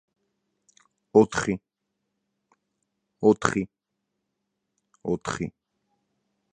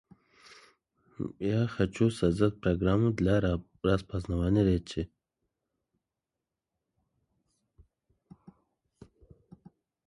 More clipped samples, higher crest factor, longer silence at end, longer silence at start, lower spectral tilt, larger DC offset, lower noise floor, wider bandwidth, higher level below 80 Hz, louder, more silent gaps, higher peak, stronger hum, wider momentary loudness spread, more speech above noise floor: neither; first, 28 dB vs 20 dB; second, 1.05 s vs 5 s; about the same, 1.15 s vs 1.2 s; second, -5.5 dB/octave vs -8 dB/octave; neither; second, -81 dBFS vs -89 dBFS; second, 9.8 kHz vs 11.5 kHz; second, -58 dBFS vs -46 dBFS; first, -25 LUFS vs -29 LUFS; neither; first, -2 dBFS vs -12 dBFS; neither; first, 15 LU vs 11 LU; about the same, 58 dB vs 61 dB